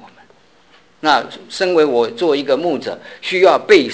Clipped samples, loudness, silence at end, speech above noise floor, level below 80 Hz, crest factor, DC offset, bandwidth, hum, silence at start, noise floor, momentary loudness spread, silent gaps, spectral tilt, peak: under 0.1%; -15 LUFS; 0 s; 36 dB; -62 dBFS; 16 dB; 0.2%; 8 kHz; none; 1.05 s; -51 dBFS; 12 LU; none; -4 dB/octave; 0 dBFS